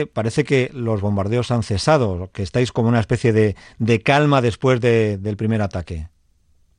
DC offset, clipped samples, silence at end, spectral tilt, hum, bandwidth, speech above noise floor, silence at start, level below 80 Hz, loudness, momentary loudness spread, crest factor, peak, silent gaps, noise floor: under 0.1%; under 0.1%; 0.7 s; -6.5 dB/octave; none; 10.5 kHz; 39 dB; 0 s; -44 dBFS; -19 LUFS; 9 LU; 16 dB; -4 dBFS; none; -58 dBFS